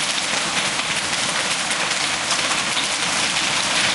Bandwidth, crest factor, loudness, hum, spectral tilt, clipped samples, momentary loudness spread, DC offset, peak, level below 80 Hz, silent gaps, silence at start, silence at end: 12 kHz; 18 dB; -19 LUFS; none; -0.5 dB/octave; under 0.1%; 2 LU; under 0.1%; -4 dBFS; -56 dBFS; none; 0 s; 0 s